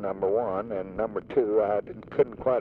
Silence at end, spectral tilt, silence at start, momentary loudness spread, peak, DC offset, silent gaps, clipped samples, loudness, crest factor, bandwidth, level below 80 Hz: 0 s; -9.5 dB/octave; 0 s; 7 LU; -10 dBFS; under 0.1%; none; under 0.1%; -28 LUFS; 18 dB; 4.2 kHz; -56 dBFS